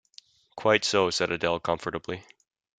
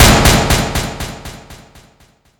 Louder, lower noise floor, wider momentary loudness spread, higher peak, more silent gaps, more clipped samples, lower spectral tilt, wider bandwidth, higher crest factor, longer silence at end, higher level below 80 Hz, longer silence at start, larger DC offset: second, -26 LUFS vs -12 LUFS; first, -56 dBFS vs -51 dBFS; second, 13 LU vs 23 LU; second, -4 dBFS vs 0 dBFS; neither; neither; about the same, -3.5 dB/octave vs -3.5 dB/octave; second, 9.6 kHz vs over 20 kHz; first, 24 dB vs 14 dB; second, 0.6 s vs 0.85 s; second, -62 dBFS vs -22 dBFS; first, 0.55 s vs 0 s; neither